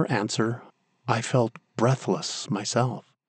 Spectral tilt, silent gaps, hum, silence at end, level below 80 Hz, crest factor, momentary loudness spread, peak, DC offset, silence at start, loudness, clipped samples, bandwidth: -5 dB/octave; none; none; 0.25 s; -76 dBFS; 20 dB; 6 LU; -6 dBFS; under 0.1%; 0 s; -26 LUFS; under 0.1%; 9.4 kHz